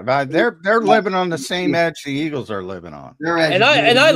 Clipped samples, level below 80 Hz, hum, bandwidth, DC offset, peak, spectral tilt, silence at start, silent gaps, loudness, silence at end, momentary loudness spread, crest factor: under 0.1%; -58 dBFS; none; 15.5 kHz; under 0.1%; 0 dBFS; -4.5 dB/octave; 0 s; none; -16 LUFS; 0 s; 15 LU; 16 dB